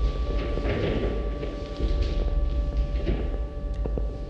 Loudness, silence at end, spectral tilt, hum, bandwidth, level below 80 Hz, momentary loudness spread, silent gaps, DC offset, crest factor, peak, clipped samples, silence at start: -29 LUFS; 0 s; -8 dB/octave; none; 6.4 kHz; -28 dBFS; 5 LU; none; under 0.1%; 14 dB; -12 dBFS; under 0.1%; 0 s